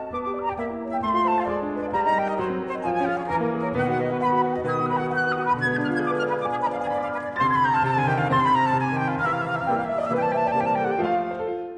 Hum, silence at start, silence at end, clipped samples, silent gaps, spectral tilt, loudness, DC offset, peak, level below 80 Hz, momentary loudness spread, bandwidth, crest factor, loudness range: none; 0 s; 0 s; under 0.1%; none; -7.5 dB/octave; -24 LUFS; under 0.1%; -8 dBFS; -54 dBFS; 7 LU; 10 kHz; 14 dB; 2 LU